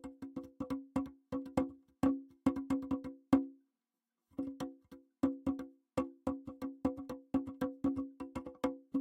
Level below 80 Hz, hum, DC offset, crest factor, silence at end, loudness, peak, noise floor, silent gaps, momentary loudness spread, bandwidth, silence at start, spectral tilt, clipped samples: -62 dBFS; none; under 0.1%; 24 dB; 0 s; -39 LUFS; -14 dBFS; under -90 dBFS; none; 11 LU; 11.5 kHz; 0.05 s; -7.5 dB/octave; under 0.1%